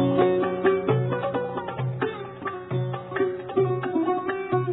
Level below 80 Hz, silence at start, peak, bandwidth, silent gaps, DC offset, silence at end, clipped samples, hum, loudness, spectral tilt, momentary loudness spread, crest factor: -62 dBFS; 0 s; -8 dBFS; 4.1 kHz; none; under 0.1%; 0 s; under 0.1%; none; -26 LUFS; -11.5 dB/octave; 8 LU; 18 dB